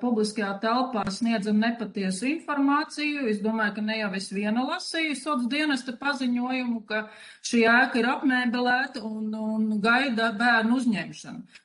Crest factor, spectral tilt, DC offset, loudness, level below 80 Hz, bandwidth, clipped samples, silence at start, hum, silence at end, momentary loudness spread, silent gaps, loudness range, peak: 16 dB; -4.5 dB/octave; under 0.1%; -25 LUFS; -70 dBFS; 10.5 kHz; under 0.1%; 0 s; none; 0.2 s; 9 LU; none; 4 LU; -10 dBFS